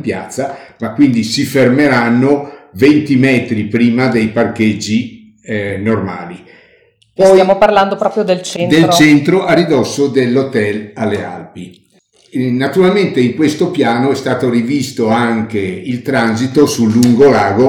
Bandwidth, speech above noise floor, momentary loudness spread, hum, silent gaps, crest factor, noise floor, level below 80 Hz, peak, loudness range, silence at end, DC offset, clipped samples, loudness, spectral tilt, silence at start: 17.5 kHz; 39 dB; 13 LU; none; none; 12 dB; -50 dBFS; -50 dBFS; 0 dBFS; 5 LU; 0 s; under 0.1%; 0.1%; -12 LUFS; -6 dB/octave; 0 s